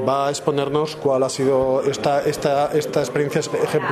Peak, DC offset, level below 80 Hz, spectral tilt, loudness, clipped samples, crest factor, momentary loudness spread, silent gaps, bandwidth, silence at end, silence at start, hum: -4 dBFS; under 0.1%; -54 dBFS; -5 dB/octave; -20 LUFS; under 0.1%; 16 dB; 3 LU; none; 14 kHz; 0 s; 0 s; none